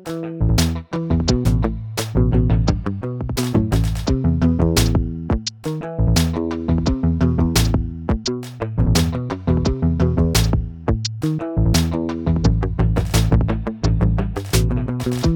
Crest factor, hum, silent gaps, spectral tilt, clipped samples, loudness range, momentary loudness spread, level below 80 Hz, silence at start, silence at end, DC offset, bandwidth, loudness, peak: 16 dB; none; none; -6 dB/octave; under 0.1%; 1 LU; 6 LU; -24 dBFS; 0 s; 0 s; under 0.1%; 19.5 kHz; -20 LUFS; -2 dBFS